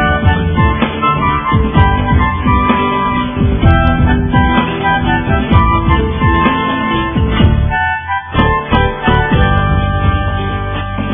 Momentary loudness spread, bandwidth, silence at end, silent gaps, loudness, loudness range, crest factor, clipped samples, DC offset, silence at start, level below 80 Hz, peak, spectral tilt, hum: 4 LU; 3.8 kHz; 0 s; none; -12 LUFS; 1 LU; 12 dB; under 0.1%; under 0.1%; 0 s; -18 dBFS; 0 dBFS; -10.5 dB/octave; none